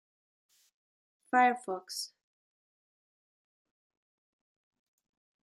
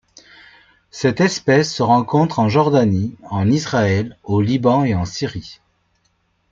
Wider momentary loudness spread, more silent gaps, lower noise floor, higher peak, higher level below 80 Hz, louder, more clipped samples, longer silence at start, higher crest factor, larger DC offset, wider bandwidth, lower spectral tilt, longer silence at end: first, 13 LU vs 9 LU; neither; first, under -90 dBFS vs -64 dBFS; second, -14 dBFS vs -2 dBFS; second, under -90 dBFS vs -52 dBFS; second, -31 LUFS vs -17 LUFS; neither; first, 1.35 s vs 0.95 s; first, 24 dB vs 16 dB; neither; first, 14 kHz vs 7.6 kHz; second, -2 dB/octave vs -6.5 dB/octave; first, 3.4 s vs 0.95 s